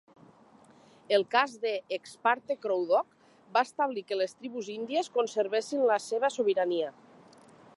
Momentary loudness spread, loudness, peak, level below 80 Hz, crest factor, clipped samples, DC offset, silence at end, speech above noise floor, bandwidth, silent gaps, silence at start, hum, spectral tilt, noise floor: 8 LU; -30 LUFS; -10 dBFS; -86 dBFS; 20 dB; under 0.1%; under 0.1%; 0.85 s; 29 dB; 11.5 kHz; none; 1.1 s; none; -3 dB/octave; -58 dBFS